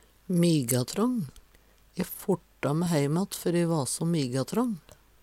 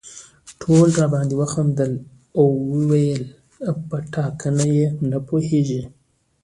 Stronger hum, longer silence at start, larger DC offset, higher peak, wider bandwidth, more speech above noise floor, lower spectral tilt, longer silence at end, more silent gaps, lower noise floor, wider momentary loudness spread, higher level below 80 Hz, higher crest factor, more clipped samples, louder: neither; first, 0.3 s vs 0.05 s; neither; second, -10 dBFS vs -2 dBFS; first, 17 kHz vs 11.5 kHz; first, 32 dB vs 24 dB; second, -5.5 dB/octave vs -7.5 dB/octave; about the same, 0.45 s vs 0.55 s; neither; first, -59 dBFS vs -43 dBFS; second, 10 LU vs 14 LU; second, -60 dBFS vs -54 dBFS; about the same, 18 dB vs 18 dB; neither; second, -28 LUFS vs -20 LUFS